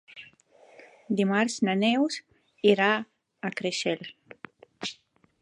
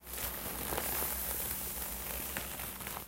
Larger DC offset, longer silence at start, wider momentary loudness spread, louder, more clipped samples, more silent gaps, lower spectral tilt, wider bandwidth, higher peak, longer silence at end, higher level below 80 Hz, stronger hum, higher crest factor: neither; first, 0.15 s vs 0 s; first, 23 LU vs 5 LU; first, -27 LUFS vs -36 LUFS; neither; neither; first, -4.5 dB/octave vs -2 dB/octave; second, 11 kHz vs 17 kHz; first, -6 dBFS vs -18 dBFS; first, 0.5 s vs 0 s; second, -78 dBFS vs -50 dBFS; neither; about the same, 22 dB vs 20 dB